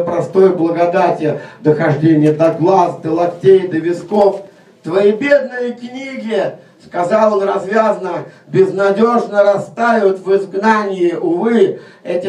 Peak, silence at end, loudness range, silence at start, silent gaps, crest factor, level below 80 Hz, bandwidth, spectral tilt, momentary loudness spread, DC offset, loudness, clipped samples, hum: 0 dBFS; 0 s; 3 LU; 0 s; none; 14 dB; -62 dBFS; 9.8 kHz; -7.5 dB/octave; 11 LU; under 0.1%; -14 LUFS; under 0.1%; none